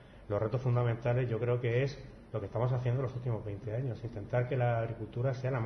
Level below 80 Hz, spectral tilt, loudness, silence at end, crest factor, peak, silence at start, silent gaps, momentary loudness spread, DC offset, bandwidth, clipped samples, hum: -56 dBFS; -9 dB/octave; -34 LUFS; 0 s; 14 dB; -18 dBFS; 0 s; none; 7 LU; under 0.1%; 6.4 kHz; under 0.1%; none